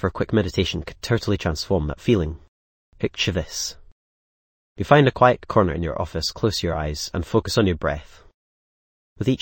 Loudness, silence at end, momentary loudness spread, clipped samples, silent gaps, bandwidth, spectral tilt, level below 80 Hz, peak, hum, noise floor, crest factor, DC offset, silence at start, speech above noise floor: -22 LUFS; 0.05 s; 12 LU; under 0.1%; 2.48-2.92 s, 3.92-4.76 s, 8.34-9.16 s; 17 kHz; -5.5 dB/octave; -38 dBFS; 0 dBFS; none; under -90 dBFS; 22 dB; under 0.1%; 0 s; over 69 dB